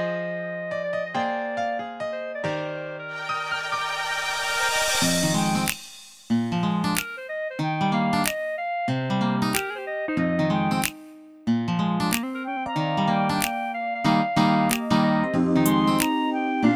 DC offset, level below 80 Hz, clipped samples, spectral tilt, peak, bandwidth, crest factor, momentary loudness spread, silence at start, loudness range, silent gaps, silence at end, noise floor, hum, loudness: under 0.1%; -56 dBFS; under 0.1%; -4.5 dB/octave; -4 dBFS; 19.5 kHz; 20 dB; 9 LU; 0 s; 6 LU; none; 0 s; -45 dBFS; none; -24 LUFS